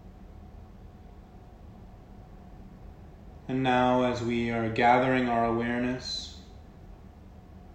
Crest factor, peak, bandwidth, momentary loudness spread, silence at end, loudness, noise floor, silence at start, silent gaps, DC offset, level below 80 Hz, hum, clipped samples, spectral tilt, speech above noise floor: 22 dB; -10 dBFS; 8.6 kHz; 27 LU; 0 s; -27 LUFS; -49 dBFS; 0.05 s; none; under 0.1%; -50 dBFS; none; under 0.1%; -6 dB/octave; 23 dB